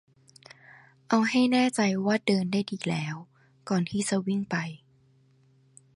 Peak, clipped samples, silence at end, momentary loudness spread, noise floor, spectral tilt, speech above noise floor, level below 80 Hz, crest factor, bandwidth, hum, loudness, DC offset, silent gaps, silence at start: -10 dBFS; under 0.1%; 1.2 s; 11 LU; -62 dBFS; -5 dB/octave; 36 dB; -70 dBFS; 20 dB; 11.5 kHz; none; -27 LUFS; under 0.1%; none; 1.1 s